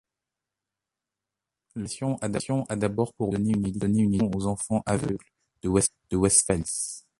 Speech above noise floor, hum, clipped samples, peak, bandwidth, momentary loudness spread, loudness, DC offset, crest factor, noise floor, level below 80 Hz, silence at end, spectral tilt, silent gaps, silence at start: 62 dB; none; under 0.1%; -6 dBFS; 11.5 kHz; 12 LU; -26 LUFS; under 0.1%; 20 dB; -88 dBFS; -48 dBFS; 0.2 s; -5 dB/octave; none; 1.75 s